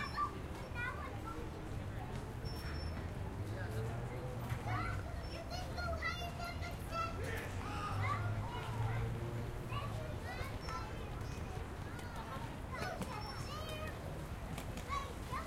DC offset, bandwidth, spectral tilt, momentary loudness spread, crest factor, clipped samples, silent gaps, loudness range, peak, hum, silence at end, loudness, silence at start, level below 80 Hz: under 0.1%; 16 kHz; -5.5 dB/octave; 6 LU; 14 dB; under 0.1%; none; 4 LU; -26 dBFS; none; 0 s; -43 LUFS; 0 s; -50 dBFS